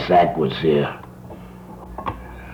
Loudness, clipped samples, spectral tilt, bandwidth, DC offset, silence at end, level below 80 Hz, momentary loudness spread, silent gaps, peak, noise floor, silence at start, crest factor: -21 LUFS; under 0.1%; -7.5 dB/octave; 17.5 kHz; under 0.1%; 0 s; -42 dBFS; 22 LU; none; -6 dBFS; -38 dBFS; 0 s; 16 dB